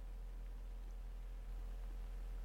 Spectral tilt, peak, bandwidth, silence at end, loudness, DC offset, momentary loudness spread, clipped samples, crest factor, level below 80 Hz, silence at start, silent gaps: -6 dB/octave; -40 dBFS; 7.8 kHz; 0 s; -53 LUFS; under 0.1%; 2 LU; under 0.1%; 6 dB; -48 dBFS; 0 s; none